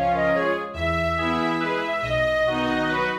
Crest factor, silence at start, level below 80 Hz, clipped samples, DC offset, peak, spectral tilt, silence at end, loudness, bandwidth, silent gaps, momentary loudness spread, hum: 12 dB; 0 s; -42 dBFS; under 0.1%; under 0.1%; -10 dBFS; -6 dB/octave; 0 s; -23 LUFS; 13.5 kHz; none; 4 LU; none